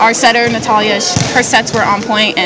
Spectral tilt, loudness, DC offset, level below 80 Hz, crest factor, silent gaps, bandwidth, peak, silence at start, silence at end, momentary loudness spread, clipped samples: -3 dB/octave; -11 LUFS; under 0.1%; -40 dBFS; 12 dB; none; 8 kHz; 0 dBFS; 0 s; 0 s; 3 LU; 0.7%